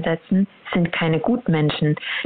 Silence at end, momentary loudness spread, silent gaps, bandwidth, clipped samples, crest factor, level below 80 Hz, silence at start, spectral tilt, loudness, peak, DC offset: 0 s; 3 LU; none; 4.5 kHz; under 0.1%; 12 dB; -52 dBFS; 0 s; -11 dB/octave; -21 LUFS; -8 dBFS; under 0.1%